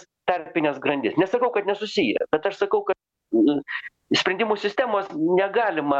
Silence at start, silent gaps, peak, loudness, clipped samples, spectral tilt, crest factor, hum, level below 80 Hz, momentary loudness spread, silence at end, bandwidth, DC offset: 0.25 s; none; -6 dBFS; -23 LUFS; under 0.1%; -5 dB/octave; 18 dB; none; -66 dBFS; 6 LU; 0 s; 8 kHz; under 0.1%